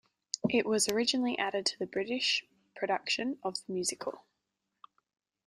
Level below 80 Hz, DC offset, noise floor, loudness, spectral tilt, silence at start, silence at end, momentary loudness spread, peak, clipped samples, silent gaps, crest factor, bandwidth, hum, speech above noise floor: -74 dBFS; under 0.1%; -85 dBFS; -32 LUFS; -2.5 dB/octave; 0.35 s; 1.3 s; 9 LU; -12 dBFS; under 0.1%; none; 22 dB; 15.5 kHz; none; 52 dB